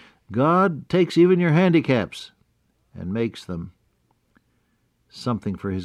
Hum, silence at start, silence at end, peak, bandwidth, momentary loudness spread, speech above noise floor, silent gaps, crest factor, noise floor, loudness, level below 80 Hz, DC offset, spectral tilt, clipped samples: none; 0.3 s; 0 s; -6 dBFS; 11 kHz; 18 LU; 47 dB; none; 16 dB; -67 dBFS; -21 LUFS; -60 dBFS; under 0.1%; -7.5 dB/octave; under 0.1%